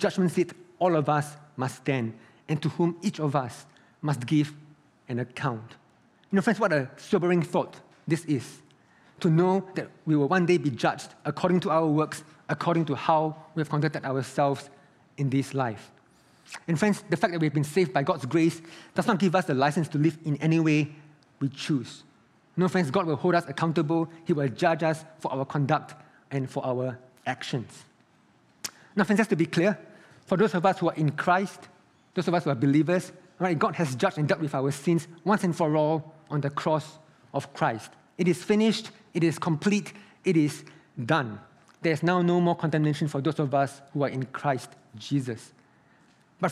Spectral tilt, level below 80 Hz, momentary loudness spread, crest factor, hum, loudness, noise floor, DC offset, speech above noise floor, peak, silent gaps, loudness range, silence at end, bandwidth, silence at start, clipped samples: -6.5 dB/octave; -74 dBFS; 11 LU; 20 dB; none; -27 LUFS; -62 dBFS; under 0.1%; 36 dB; -6 dBFS; none; 4 LU; 0 s; 13.5 kHz; 0 s; under 0.1%